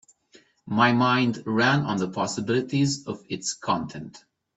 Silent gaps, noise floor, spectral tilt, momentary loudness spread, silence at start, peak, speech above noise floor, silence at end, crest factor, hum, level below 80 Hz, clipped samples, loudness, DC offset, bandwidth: none; -58 dBFS; -5 dB/octave; 12 LU; 0.65 s; -4 dBFS; 34 dB; 0.4 s; 20 dB; none; -64 dBFS; under 0.1%; -24 LUFS; under 0.1%; 8.4 kHz